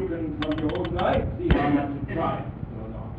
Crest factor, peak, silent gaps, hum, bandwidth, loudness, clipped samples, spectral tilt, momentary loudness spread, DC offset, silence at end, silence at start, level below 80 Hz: 18 dB; -8 dBFS; none; none; 5.2 kHz; -26 LUFS; under 0.1%; -9 dB/octave; 13 LU; 0.1%; 0 s; 0 s; -36 dBFS